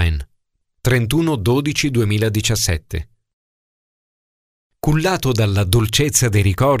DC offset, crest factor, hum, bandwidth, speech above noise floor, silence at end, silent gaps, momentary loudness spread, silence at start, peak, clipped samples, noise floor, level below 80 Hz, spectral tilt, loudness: under 0.1%; 18 dB; none; 16 kHz; 51 dB; 0 s; 3.33-4.70 s; 9 LU; 0 s; 0 dBFS; under 0.1%; -68 dBFS; -32 dBFS; -4.5 dB/octave; -17 LUFS